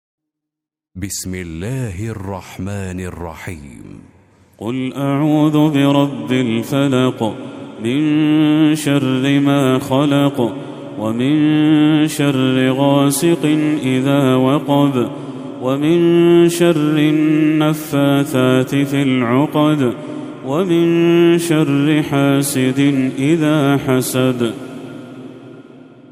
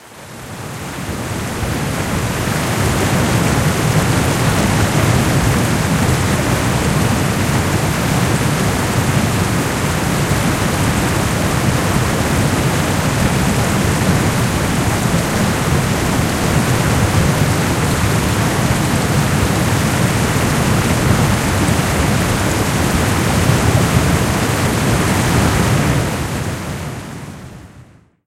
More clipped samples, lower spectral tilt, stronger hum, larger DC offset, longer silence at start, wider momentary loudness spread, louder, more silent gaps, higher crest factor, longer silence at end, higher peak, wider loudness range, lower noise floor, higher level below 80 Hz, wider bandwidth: neither; about the same, -6 dB/octave vs -5 dB/octave; neither; neither; first, 0.95 s vs 0 s; first, 15 LU vs 6 LU; about the same, -15 LUFS vs -15 LUFS; neither; about the same, 16 dB vs 16 dB; second, 0.3 s vs 0.45 s; about the same, 0 dBFS vs 0 dBFS; first, 9 LU vs 2 LU; first, -83 dBFS vs -43 dBFS; second, -54 dBFS vs -28 dBFS; about the same, 16 kHz vs 16 kHz